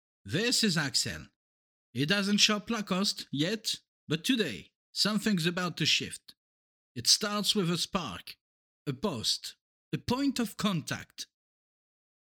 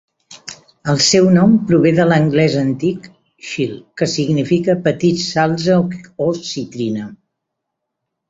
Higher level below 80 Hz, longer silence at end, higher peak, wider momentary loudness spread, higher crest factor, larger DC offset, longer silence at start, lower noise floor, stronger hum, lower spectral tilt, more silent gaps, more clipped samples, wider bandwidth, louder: second, -64 dBFS vs -52 dBFS; about the same, 1.15 s vs 1.15 s; second, -10 dBFS vs -2 dBFS; about the same, 18 LU vs 16 LU; first, 22 dB vs 14 dB; neither; about the same, 0.25 s vs 0.3 s; first, under -90 dBFS vs -77 dBFS; neither; second, -3 dB/octave vs -5.5 dB/octave; first, 1.36-1.93 s, 3.88-4.07 s, 4.75-4.93 s, 6.37-6.95 s, 8.41-8.86 s, 9.61-9.92 s vs none; neither; first, 20 kHz vs 8 kHz; second, -29 LUFS vs -15 LUFS